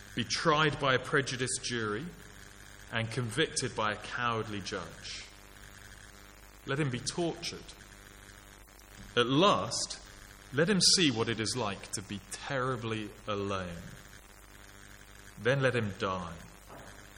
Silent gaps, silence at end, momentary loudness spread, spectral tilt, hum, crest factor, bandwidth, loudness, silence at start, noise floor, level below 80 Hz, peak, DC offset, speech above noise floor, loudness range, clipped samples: none; 0 s; 25 LU; -3.5 dB/octave; 50 Hz at -55 dBFS; 22 dB; 17 kHz; -31 LUFS; 0 s; -54 dBFS; -56 dBFS; -12 dBFS; under 0.1%; 22 dB; 10 LU; under 0.1%